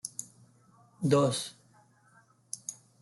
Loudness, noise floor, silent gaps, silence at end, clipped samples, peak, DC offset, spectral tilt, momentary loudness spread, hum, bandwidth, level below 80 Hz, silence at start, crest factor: -32 LUFS; -64 dBFS; none; 0.3 s; under 0.1%; -12 dBFS; under 0.1%; -5 dB/octave; 17 LU; none; 12.5 kHz; -74 dBFS; 0.05 s; 22 dB